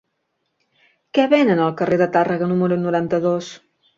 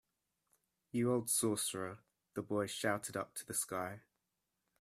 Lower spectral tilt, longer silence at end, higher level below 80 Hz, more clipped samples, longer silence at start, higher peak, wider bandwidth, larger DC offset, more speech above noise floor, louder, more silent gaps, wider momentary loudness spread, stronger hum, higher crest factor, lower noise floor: first, -7 dB/octave vs -3.5 dB/octave; second, 0.4 s vs 0.8 s; first, -62 dBFS vs -78 dBFS; neither; first, 1.15 s vs 0.95 s; first, -2 dBFS vs -20 dBFS; second, 7.6 kHz vs 15.5 kHz; neither; first, 55 dB vs 49 dB; first, -18 LUFS vs -38 LUFS; neither; second, 7 LU vs 14 LU; neither; about the same, 18 dB vs 20 dB; second, -73 dBFS vs -87 dBFS